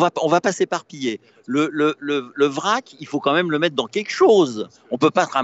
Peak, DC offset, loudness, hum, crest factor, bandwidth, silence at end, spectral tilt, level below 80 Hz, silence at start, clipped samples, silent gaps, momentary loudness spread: -4 dBFS; under 0.1%; -20 LUFS; none; 16 dB; 8.2 kHz; 0 s; -4.5 dB/octave; -72 dBFS; 0 s; under 0.1%; none; 11 LU